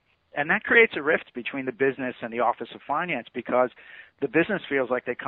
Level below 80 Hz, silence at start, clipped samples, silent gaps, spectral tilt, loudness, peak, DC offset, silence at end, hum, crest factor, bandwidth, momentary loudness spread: -66 dBFS; 0.35 s; under 0.1%; none; -9 dB/octave; -25 LUFS; -6 dBFS; under 0.1%; 0 s; none; 20 dB; 4.2 kHz; 13 LU